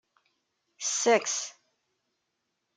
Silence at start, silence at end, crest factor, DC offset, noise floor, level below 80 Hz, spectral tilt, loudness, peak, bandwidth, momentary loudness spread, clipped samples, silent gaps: 0.8 s; 1.25 s; 22 dB; under 0.1%; -81 dBFS; -88 dBFS; -0.5 dB/octave; -27 LUFS; -10 dBFS; 10.5 kHz; 11 LU; under 0.1%; none